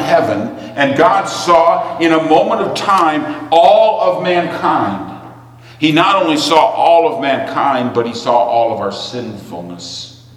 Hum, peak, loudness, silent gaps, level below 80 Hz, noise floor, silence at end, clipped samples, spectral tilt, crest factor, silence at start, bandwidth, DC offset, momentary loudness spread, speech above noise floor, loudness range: none; 0 dBFS; -13 LUFS; none; -56 dBFS; -37 dBFS; 0.25 s; under 0.1%; -4.5 dB/octave; 14 dB; 0 s; 13.5 kHz; under 0.1%; 15 LU; 24 dB; 3 LU